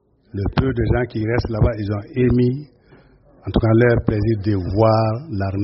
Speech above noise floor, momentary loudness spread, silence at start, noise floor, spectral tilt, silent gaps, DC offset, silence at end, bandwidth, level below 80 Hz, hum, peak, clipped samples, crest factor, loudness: 32 dB; 9 LU; 0.35 s; -50 dBFS; -7.5 dB/octave; none; under 0.1%; 0 s; 5.8 kHz; -32 dBFS; none; -2 dBFS; under 0.1%; 18 dB; -19 LUFS